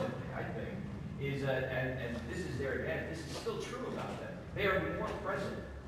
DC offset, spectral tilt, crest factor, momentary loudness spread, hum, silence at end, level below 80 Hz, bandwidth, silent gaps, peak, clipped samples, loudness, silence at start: under 0.1%; -6 dB/octave; 18 dB; 8 LU; none; 0 s; -54 dBFS; 15 kHz; none; -20 dBFS; under 0.1%; -38 LUFS; 0 s